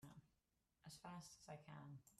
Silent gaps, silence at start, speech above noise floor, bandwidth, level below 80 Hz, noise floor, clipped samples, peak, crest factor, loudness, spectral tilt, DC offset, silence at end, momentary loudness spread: none; 0 s; 28 dB; 13.5 kHz; -84 dBFS; -87 dBFS; under 0.1%; -44 dBFS; 16 dB; -60 LUFS; -4.5 dB/octave; under 0.1%; 0 s; 9 LU